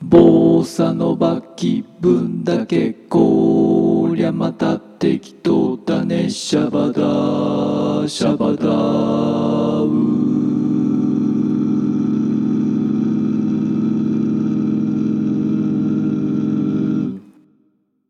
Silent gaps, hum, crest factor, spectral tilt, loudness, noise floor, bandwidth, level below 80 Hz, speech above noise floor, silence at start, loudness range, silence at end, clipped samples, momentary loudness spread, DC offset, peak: none; none; 16 dB; -7.5 dB/octave; -17 LUFS; -61 dBFS; 11 kHz; -52 dBFS; 45 dB; 0 s; 2 LU; 0.9 s; under 0.1%; 5 LU; under 0.1%; 0 dBFS